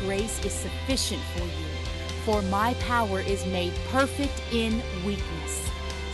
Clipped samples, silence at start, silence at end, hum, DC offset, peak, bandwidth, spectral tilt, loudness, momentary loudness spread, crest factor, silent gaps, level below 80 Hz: under 0.1%; 0 s; 0 s; none; under 0.1%; -10 dBFS; 12 kHz; -4.5 dB/octave; -28 LUFS; 7 LU; 18 dB; none; -36 dBFS